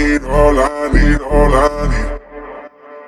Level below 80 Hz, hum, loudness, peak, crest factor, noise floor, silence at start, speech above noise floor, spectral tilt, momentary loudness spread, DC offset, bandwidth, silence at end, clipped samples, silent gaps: -18 dBFS; none; -14 LUFS; 0 dBFS; 12 dB; -35 dBFS; 0 s; 23 dB; -6.5 dB/octave; 19 LU; under 0.1%; 11.5 kHz; 0 s; under 0.1%; none